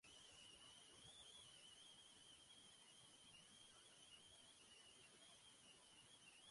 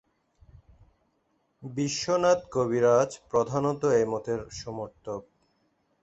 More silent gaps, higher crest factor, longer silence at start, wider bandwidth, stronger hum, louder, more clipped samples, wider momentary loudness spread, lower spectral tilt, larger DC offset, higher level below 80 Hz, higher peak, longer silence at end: neither; second, 14 dB vs 20 dB; second, 0.05 s vs 1.6 s; first, 11.5 kHz vs 8.2 kHz; neither; second, -64 LUFS vs -27 LUFS; neither; second, 3 LU vs 16 LU; second, -1 dB/octave vs -5 dB/octave; neither; second, -88 dBFS vs -60 dBFS; second, -54 dBFS vs -10 dBFS; second, 0 s vs 0.8 s